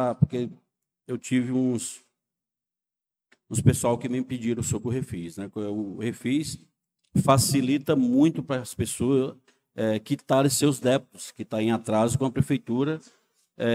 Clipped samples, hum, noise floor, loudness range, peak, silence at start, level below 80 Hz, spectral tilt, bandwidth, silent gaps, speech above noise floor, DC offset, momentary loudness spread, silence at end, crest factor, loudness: under 0.1%; none; -87 dBFS; 5 LU; -6 dBFS; 0 s; -58 dBFS; -5.5 dB/octave; 16 kHz; none; 62 dB; under 0.1%; 14 LU; 0 s; 20 dB; -26 LUFS